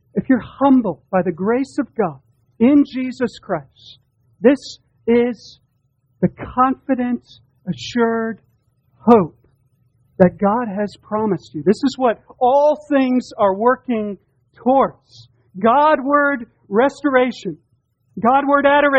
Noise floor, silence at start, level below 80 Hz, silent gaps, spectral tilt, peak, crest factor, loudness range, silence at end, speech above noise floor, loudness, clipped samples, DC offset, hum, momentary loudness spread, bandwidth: -64 dBFS; 0.15 s; -52 dBFS; none; -7 dB/octave; 0 dBFS; 18 dB; 4 LU; 0 s; 47 dB; -18 LUFS; under 0.1%; under 0.1%; none; 13 LU; 8.8 kHz